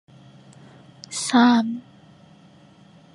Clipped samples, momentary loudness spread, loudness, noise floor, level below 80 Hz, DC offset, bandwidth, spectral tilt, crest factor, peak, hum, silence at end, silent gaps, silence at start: under 0.1%; 19 LU; -20 LUFS; -51 dBFS; -72 dBFS; under 0.1%; 11.5 kHz; -3.5 dB/octave; 20 dB; -6 dBFS; none; 1.35 s; none; 1.1 s